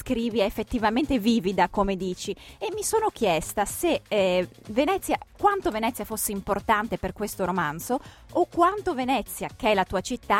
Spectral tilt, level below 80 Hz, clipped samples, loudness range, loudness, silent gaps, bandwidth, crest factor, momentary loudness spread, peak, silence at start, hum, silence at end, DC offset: -4 dB/octave; -46 dBFS; under 0.1%; 1 LU; -26 LUFS; none; 16.5 kHz; 16 dB; 8 LU; -8 dBFS; 0 s; none; 0 s; under 0.1%